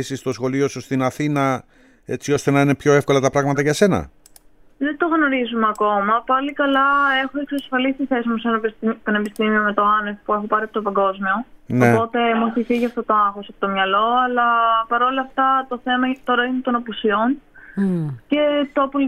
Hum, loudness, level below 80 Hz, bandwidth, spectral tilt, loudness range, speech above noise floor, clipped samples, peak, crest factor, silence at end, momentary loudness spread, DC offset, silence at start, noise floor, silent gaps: none; -19 LUFS; -52 dBFS; 15 kHz; -5.5 dB/octave; 2 LU; 30 dB; under 0.1%; -2 dBFS; 18 dB; 0 s; 8 LU; under 0.1%; 0 s; -49 dBFS; none